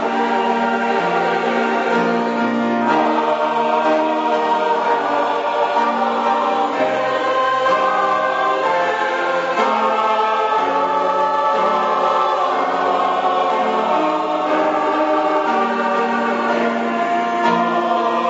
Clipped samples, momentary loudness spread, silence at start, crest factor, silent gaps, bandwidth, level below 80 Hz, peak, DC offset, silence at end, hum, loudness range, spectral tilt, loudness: under 0.1%; 2 LU; 0 s; 14 dB; none; 8 kHz; -68 dBFS; -4 dBFS; under 0.1%; 0 s; none; 1 LU; -2 dB/octave; -17 LUFS